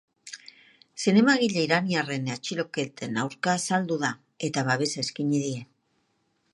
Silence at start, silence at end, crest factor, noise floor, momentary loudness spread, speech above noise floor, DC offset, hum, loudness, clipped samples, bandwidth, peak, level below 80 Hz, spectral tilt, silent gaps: 0.25 s; 0.9 s; 20 dB; -72 dBFS; 15 LU; 46 dB; under 0.1%; none; -26 LUFS; under 0.1%; 11.5 kHz; -6 dBFS; -74 dBFS; -4.5 dB/octave; none